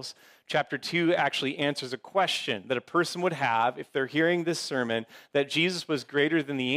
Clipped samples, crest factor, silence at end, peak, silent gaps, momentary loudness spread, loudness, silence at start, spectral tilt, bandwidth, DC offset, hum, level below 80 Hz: under 0.1%; 16 dB; 0 s; -12 dBFS; none; 6 LU; -28 LUFS; 0 s; -4.5 dB/octave; 15.5 kHz; under 0.1%; none; -78 dBFS